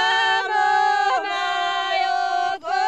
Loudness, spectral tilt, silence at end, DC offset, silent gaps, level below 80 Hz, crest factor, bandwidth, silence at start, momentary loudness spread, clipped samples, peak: -20 LUFS; -0.5 dB/octave; 0 s; 0.2%; none; -70 dBFS; 12 dB; 10.5 kHz; 0 s; 5 LU; under 0.1%; -8 dBFS